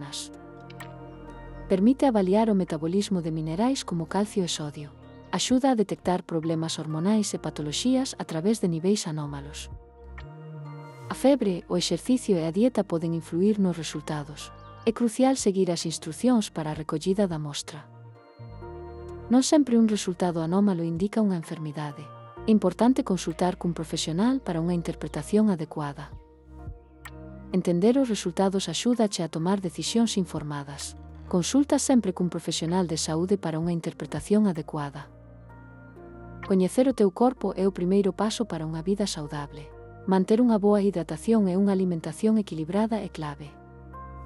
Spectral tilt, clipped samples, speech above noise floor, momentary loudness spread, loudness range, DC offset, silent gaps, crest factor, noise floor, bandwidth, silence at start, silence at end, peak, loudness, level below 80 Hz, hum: -5.5 dB/octave; under 0.1%; 22 dB; 20 LU; 4 LU; under 0.1%; none; 16 dB; -47 dBFS; 12 kHz; 0 s; 0 s; -10 dBFS; -26 LUFS; -52 dBFS; none